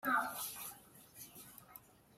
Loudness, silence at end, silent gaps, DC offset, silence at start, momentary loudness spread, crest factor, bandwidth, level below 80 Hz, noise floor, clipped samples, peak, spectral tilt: -42 LUFS; 0.4 s; none; under 0.1%; 0.05 s; 21 LU; 22 dB; 16 kHz; -78 dBFS; -61 dBFS; under 0.1%; -22 dBFS; -1.5 dB/octave